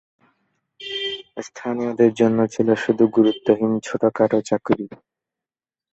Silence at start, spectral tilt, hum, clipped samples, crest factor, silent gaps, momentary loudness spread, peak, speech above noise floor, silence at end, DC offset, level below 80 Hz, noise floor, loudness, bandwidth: 0.8 s; -6 dB/octave; none; under 0.1%; 18 dB; none; 14 LU; -2 dBFS; over 71 dB; 1 s; under 0.1%; -62 dBFS; under -90 dBFS; -20 LUFS; 8.2 kHz